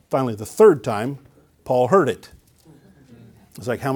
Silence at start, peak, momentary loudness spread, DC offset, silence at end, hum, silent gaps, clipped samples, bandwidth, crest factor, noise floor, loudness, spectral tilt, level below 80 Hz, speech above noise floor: 0.1 s; -2 dBFS; 18 LU; under 0.1%; 0 s; none; none; under 0.1%; 19 kHz; 18 dB; -51 dBFS; -19 LUFS; -6.5 dB/octave; -58 dBFS; 32 dB